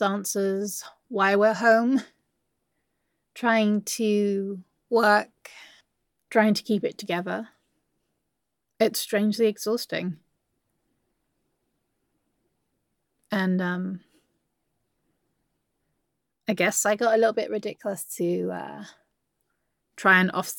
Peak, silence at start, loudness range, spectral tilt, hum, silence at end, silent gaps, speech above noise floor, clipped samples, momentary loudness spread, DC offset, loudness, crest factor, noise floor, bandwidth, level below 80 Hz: -4 dBFS; 0 s; 8 LU; -4.5 dB/octave; none; 0 s; none; 57 dB; under 0.1%; 15 LU; under 0.1%; -24 LUFS; 22 dB; -81 dBFS; 17.5 kHz; -82 dBFS